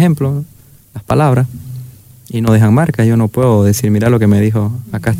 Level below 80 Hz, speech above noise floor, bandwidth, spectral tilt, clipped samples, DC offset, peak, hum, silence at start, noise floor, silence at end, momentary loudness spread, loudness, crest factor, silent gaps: -42 dBFS; 23 dB; 16 kHz; -7.5 dB/octave; under 0.1%; under 0.1%; -2 dBFS; none; 0 s; -35 dBFS; 0 s; 18 LU; -12 LUFS; 10 dB; none